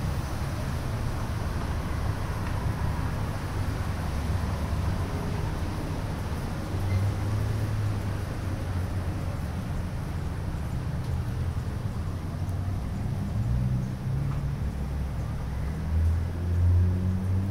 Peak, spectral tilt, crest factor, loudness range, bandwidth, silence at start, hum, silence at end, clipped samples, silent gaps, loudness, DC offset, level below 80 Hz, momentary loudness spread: -16 dBFS; -7 dB/octave; 14 dB; 3 LU; 16 kHz; 0 s; none; 0 s; under 0.1%; none; -30 LUFS; under 0.1%; -36 dBFS; 5 LU